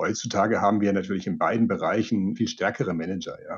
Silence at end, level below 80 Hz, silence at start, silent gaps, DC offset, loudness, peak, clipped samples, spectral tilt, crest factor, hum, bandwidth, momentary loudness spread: 0 s; -64 dBFS; 0 s; none; under 0.1%; -25 LUFS; -8 dBFS; under 0.1%; -5.5 dB/octave; 18 dB; none; 7.4 kHz; 7 LU